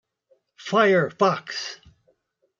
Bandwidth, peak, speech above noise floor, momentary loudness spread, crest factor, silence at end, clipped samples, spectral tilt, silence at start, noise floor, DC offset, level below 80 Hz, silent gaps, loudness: 7.6 kHz; -6 dBFS; 48 dB; 19 LU; 20 dB; 0.85 s; under 0.1%; -5 dB/octave; 0.6 s; -69 dBFS; under 0.1%; -68 dBFS; none; -22 LUFS